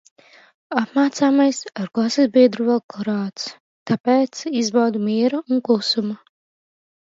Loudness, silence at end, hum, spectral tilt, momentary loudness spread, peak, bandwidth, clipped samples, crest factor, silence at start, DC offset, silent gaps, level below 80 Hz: -19 LUFS; 0.95 s; none; -5 dB/octave; 12 LU; -2 dBFS; 7.8 kHz; under 0.1%; 18 dB; 0.7 s; under 0.1%; 2.84-2.89 s, 3.60-3.86 s, 4.00-4.04 s; -70 dBFS